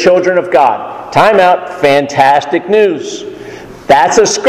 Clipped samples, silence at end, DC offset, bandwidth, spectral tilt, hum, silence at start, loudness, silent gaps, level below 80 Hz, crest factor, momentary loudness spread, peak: 1%; 0 s; under 0.1%; 14.5 kHz; -3.5 dB/octave; none; 0 s; -9 LUFS; none; -46 dBFS; 10 dB; 17 LU; 0 dBFS